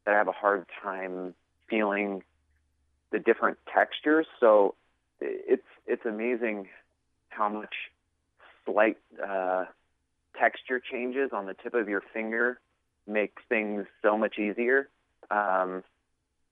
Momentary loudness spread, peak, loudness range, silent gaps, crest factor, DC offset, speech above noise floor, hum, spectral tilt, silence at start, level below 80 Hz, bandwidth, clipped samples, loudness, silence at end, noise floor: 13 LU; -10 dBFS; 5 LU; none; 20 dB; under 0.1%; 48 dB; none; -8 dB/octave; 0.05 s; -76 dBFS; 4 kHz; under 0.1%; -29 LUFS; 0.7 s; -76 dBFS